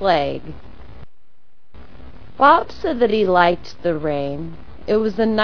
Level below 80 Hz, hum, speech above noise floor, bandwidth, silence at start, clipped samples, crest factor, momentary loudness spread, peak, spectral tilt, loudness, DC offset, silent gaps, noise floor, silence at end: -44 dBFS; none; 46 dB; 5.4 kHz; 0 s; under 0.1%; 20 dB; 20 LU; 0 dBFS; -7 dB/octave; -18 LUFS; 3%; none; -63 dBFS; 0 s